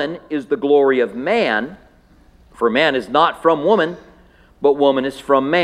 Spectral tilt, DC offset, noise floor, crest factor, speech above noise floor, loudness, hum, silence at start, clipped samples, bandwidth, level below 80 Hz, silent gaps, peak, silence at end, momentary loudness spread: -5.5 dB/octave; under 0.1%; -50 dBFS; 18 dB; 33 dB; -17 LUFS; none; 0 s; under 0.1%; 11 kHz; -54 dBFS; none; 0 dBFS; 0 s; 8 LU